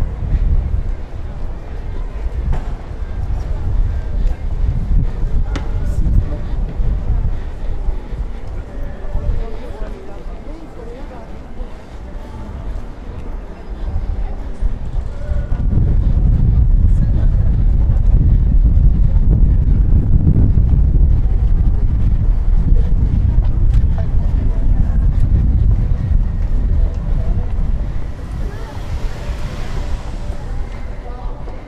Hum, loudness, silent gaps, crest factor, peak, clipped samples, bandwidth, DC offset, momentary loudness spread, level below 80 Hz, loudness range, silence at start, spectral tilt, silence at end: none; -19 LUFS; none; 14 dB; 0 dBFS; under 0.1%; 4.8 kHz; under 0.1%; 16 LU; -16 dBFS; 14 LU; 0 s; -9 dB/octave; 0 s